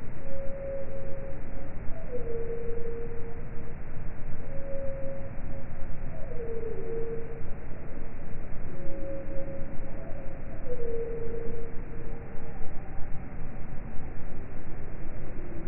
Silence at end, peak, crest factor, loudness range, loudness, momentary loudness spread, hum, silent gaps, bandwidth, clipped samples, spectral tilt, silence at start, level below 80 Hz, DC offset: 0 s; -12 dBFS; 12 dB; 3 LU; -40 LUFS; 7 LU; none; none; 2.7 kHz; under 0.1%; -6.5 dB/octave; 0 s; -34 dBFS; under 0.1%